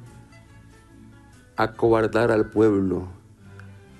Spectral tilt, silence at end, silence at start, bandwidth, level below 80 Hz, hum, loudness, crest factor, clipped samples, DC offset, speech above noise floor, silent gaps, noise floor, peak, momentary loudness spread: -7.5 dB/octave; 0.25 s; 0 s; 12.5 kHz; -48 dBFS; none; -22 LUFS; 18 dB; under 0.1%; under 0.1%; 29 dB; none; -49 dBFS; -6 dBFS; 12 LU